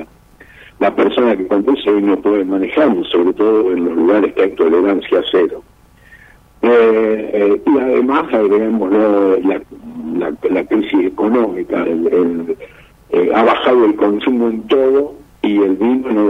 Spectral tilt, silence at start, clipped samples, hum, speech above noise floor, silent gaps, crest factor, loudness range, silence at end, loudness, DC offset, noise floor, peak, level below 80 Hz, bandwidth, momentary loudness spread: -7.5 dB/octave; 0 s; under 0.1%; none; 31 dB; none; 14 dB; 2 LU; 0 s; -14 LUFS; under 0.1%; -44 dBFS; 0 dBFS; -50 dBFS; 5.6 kHz; 7 LU